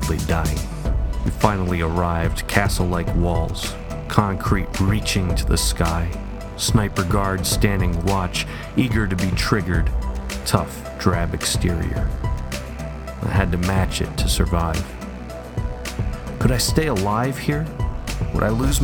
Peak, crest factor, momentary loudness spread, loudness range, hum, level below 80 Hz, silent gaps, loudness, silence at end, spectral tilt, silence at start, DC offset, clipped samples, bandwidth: 0 dBFS; 20 dB; 9 LU; 2 LU; none; -26 dBFS; none; -22 LUFS; 0 s; -5 dB/octave; 0 s; under 0.1%; under 0.1%; 19 kHz